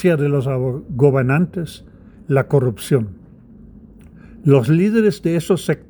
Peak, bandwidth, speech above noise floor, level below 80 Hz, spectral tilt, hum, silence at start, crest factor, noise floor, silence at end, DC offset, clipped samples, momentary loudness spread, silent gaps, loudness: 0 dBFS; over 20 kHz; 26 dB; -48 dBFS; -7.5 dB/octave; none; 0 s; 18 dB; -43 dBFS; 0.15 s; under 0.1%; under 0.1%; 8 LU; none; -17 LUFS